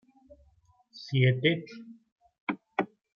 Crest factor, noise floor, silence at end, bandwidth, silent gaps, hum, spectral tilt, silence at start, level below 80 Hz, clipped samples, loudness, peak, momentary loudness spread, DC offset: 22 dB; -65 dBFS; 0.35 s; 6.4 kHz; 2.12-2.16 s, 2.40-2.47 s; none; -7.5 dB/octave; 0.95 s; -70 dBFS; under 0.1%; -29 LUFS; -10 dBFS; 22 LU; under 0.1%